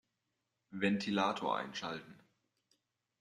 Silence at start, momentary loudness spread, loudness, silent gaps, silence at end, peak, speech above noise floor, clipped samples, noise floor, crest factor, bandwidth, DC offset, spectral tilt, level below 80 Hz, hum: 0.7 s; 12 LU; -36 LUFS; none; 1.05 s; -18 dBFS; 50 dB; under 0.1%; -86 dBFS; 22 dB; 10 kHz; under 0.1%; -5 dB/octave; -80 dBFS; none